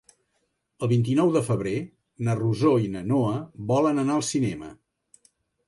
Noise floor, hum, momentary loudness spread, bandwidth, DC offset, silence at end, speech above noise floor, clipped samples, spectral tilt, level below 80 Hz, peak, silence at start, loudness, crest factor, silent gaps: -74 dBFS; none; 10 LU; 11.5 kHz; under 0.1%; 0.95 s; 51 dB; under 0.1%; -7 dB/octave; -58 dBFS; -10 dBFS; 0.8 s; -25 LUFS; 16 dB; none